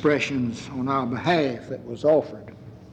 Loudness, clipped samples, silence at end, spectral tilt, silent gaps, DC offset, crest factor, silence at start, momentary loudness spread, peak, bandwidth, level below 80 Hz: -24 LUFS; under 0.1%; 0 s; -6 dB/octave; none; under 0.1%; 16 dB; 0 s; 18 LU; -8 dBFS; 9.2 kHz; -58 dBFS